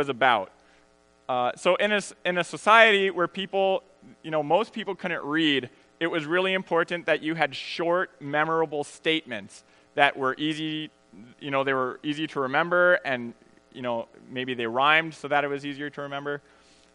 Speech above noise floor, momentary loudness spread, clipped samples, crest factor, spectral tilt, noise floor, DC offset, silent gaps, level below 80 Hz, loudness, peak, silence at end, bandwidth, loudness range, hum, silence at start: 35 dB; 14 LU; under 0.1%; 24 dB; -4.5 dB/octave; -61 dBFS; under 0.1%; none; -74 dBFS; -25 LUFS; -2 dBFS; 0.55 s; 10.5 kHz; 5 LU; none; 0 s